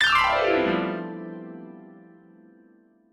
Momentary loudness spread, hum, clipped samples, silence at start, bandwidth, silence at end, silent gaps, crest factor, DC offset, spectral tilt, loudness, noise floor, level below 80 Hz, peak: 24 LU; none; under 0.1%; 0 s; 17 kHz; 1.15 s; none; 20 dB; under 0.1%; -4.5 dB/octave; -23 LUFS; -58 dBFS; -54 dBFS; -8 dBFS